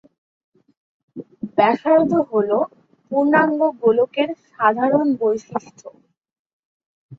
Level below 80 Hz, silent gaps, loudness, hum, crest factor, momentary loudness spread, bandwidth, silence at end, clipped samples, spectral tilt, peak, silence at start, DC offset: -66 dBFS; 6.39-6.80 s, 6.86-7.09 s; -19 LUFS; none; 18 dB; 13 LU; 7.2 kHz; 0.05 s; under 0.1%; -7 dB/octave; -2 dBFS; 1.15 s; under 0.1%